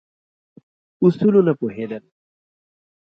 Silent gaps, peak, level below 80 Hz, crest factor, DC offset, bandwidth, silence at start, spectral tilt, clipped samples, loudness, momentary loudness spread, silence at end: none; -4 dBFS; -66 dBFS; 18 dB; under 0.1%; 5.6 kHz; 1 s; -10.5 dB/octave; under 0.1%; -18 LUFS; 15 LU; 1.05 s